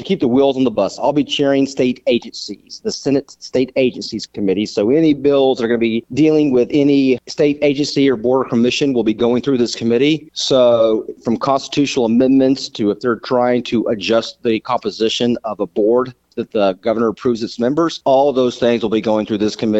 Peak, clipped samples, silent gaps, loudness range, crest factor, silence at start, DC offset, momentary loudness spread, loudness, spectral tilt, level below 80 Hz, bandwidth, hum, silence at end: -2 dBFS; under 0.1%; none; 3 LU; 14 dB; 0 s; under 0.1%; 7 LU; -16 LUFS; -5.5 dB/octave; -52 dBFS; 8.2 kHz; none; 0 s